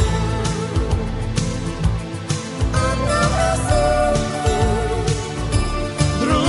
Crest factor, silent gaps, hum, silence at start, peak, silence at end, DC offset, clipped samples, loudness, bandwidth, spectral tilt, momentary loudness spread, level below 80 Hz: 16 dB; none; none; 0 s; -4 dBFS; 0 s; under 0.1%; under 0.1%; -20 LUFS; 11.5 kHz; -5.5 dB/octave; 6 LU; -24 dBFS